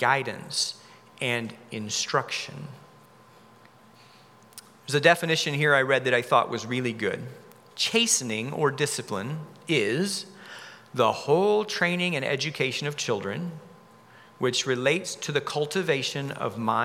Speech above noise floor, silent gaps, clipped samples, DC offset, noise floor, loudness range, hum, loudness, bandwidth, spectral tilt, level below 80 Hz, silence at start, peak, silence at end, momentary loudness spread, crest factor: 28 dB; none; under 0.1%; under 0.1%; -54 dBFS; 7 LU; none; -26 LUFS; 16.5 kHz; -3.5 dB/octave; -80 dBFS; 0 s; -2 dBFS; 0 s; 15 LU; 24 dB